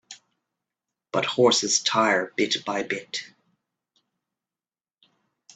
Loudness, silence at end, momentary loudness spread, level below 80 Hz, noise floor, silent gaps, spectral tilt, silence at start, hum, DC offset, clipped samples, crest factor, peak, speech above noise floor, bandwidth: -23 LUFS; 2.3 s; 10 LU; -74 dBFS; under -90 dBFS; none; -2 dB/octave; 0.1 s; none; under 0.1%; under 0.1%; 22 dB; -6 dBFS; over 67 dB; 9.2 kHz